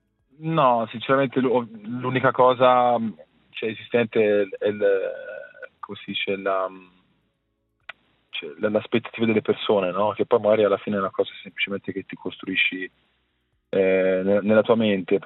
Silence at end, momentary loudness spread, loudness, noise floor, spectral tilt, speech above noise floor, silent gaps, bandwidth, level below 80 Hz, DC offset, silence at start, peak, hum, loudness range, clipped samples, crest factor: 0 s; 15 LU; -22 LUFS; -73 dBFS; -9.5 dB/octave; 51 dB; none; 4.1 kHz; -74 dBFS; under 0.1%; 0.4 s; -4 dBFS; none; 7 LU; under 0.1%; 18 dB